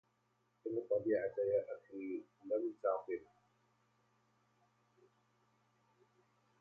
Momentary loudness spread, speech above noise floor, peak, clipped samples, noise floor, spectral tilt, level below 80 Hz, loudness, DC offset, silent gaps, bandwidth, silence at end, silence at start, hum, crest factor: 11 LU; 40 dB; -24 dBFS; under 0.1%; -79 dBFS; -7.5 dB/octave; -84 dBFS; -40 LUFS; under 0.1%; none; 4.7 kHz; 3.35 s; 0.65 s; 60 Hz at -80 dBFS; 20 dB